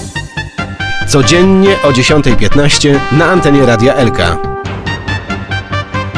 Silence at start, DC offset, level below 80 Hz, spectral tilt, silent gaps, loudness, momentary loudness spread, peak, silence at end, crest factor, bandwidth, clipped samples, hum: 0 s; under 0.1%; -24 dBFS; -5 dB/octave; none; -10 LUFS; 12 LU; 0 dBFS; 0 s; 10 dB; 11 kHz; 0.7%; none